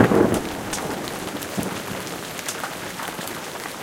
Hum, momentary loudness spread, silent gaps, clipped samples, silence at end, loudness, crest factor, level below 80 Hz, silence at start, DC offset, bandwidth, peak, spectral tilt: none; 9 LU; none; under 0.1%; 0 s; -26 LUFS; 24 dB; -48 dBFS; 0 s; under 0.1%; 17 kHz; 0 dBFS; -4.5 dB/octave